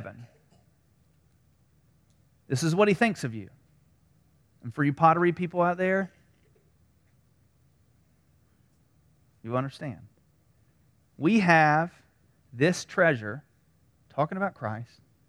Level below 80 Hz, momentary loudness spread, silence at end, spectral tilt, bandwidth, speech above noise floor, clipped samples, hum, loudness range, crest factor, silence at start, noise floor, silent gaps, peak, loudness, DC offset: -68 dBFS; 21 LU; 0.45 s; -6 dB/octave; 13.5 kHz; 40 dB; under 0.1%; none; 14 LU; 24 dB; 0 s; -65 dBFS; none; -6 dBFS; -26 LUFS; under 0.1%